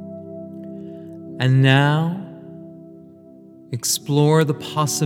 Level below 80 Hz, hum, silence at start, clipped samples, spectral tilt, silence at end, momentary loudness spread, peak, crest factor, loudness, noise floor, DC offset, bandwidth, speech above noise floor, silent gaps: -68 dBFS; none; 0 s; under 0.1%; -5 dB/octave; 0 s; 22 LU; 0 dBFS; 20 dB; -18 LUFS; -44 dBFS; under 0.1%; 17 kHz; 27 dB; none